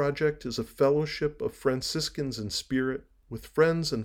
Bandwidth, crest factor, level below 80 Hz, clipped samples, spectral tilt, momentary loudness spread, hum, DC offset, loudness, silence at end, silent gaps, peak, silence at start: over 20 kHz; 18 dB; -52 dBFS; under 0.1%; -5 dB/octave; 9 LU; none; under 0.1%; -29 LUFS; 0 s; none; -10 dBFS; 0 s